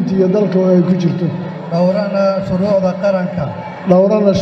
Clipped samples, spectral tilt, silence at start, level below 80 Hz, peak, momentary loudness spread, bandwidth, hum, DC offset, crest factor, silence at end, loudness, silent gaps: under 0.1%; -8.5 dB/octave; 0 s; -48 dBFS; 0 dBFS; 8 LU; 6.6 kHz; none; under 0.1%; 14 dB; 0 s; -14 LUFS; none